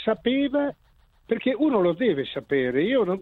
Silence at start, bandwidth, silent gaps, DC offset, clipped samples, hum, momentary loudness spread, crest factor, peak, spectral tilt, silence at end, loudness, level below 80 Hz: 0 s; 4.3 kHz; none; under 0.1%; under 0.1%; none; 6 LU; 16 dB; -8 dBFS; -8.5 dB/octave; 0 s; -24 LUFS; -58 dBFS